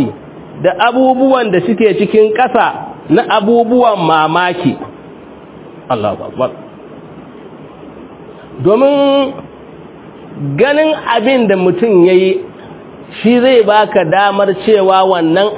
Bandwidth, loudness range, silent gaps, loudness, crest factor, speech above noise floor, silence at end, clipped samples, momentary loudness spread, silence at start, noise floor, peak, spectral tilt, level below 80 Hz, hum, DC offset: 4 kHz; 9 LU; none; -11 LUFS; 12 dB; 23 dB; 0 s; 0.2%; 21 LU; 0 s; -33 dBFS; 0 dBFS; -10 dB/octave; -52 dBFS; none; under 0.1%